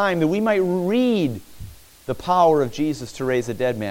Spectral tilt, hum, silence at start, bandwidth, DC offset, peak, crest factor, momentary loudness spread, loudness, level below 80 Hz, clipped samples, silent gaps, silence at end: -6.5 dB/octave; none; 0 s; 17 kHz; under 0.1%; -6 dBFS; 16 dB; 16 LU; -21 LUFS; -50 dBFS; under 0.1%; none; 0 s